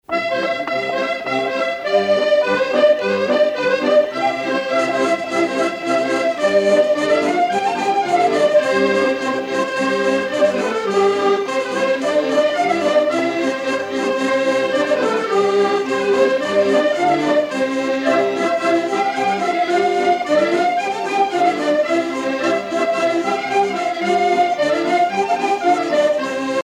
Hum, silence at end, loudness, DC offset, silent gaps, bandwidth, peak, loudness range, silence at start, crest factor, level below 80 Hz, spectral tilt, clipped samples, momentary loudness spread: none; 0 s; -17 LUFS; under 0.1%; none; 12.5 kHz; -4 dBFS; 2 LU; 0.1 s; 14 dB; -62 dBFS; -4 dB/octave; under 0.1%; 5 LU